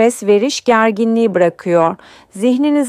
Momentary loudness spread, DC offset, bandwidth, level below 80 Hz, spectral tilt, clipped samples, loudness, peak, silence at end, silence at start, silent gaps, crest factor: 5 LU; under 0.1%; 14.5 kHz; -62 dBFS; -5 dB/octave; under 0.1%; -14 LUFS; -2 dBFS; 0 s; 0 s; none; 12 dB